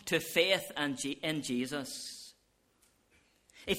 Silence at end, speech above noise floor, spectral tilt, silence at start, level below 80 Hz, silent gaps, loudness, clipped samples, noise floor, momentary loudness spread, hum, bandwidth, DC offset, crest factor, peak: 0 s; 38 dB; -3 dB/octave; 0 s; -68 dBFS; none; -33 LUFS; under 0.1%; -72 dBFS; 17 LU; none; 16.5 kHz; under 0.1%; 24 dB; -12 dBFS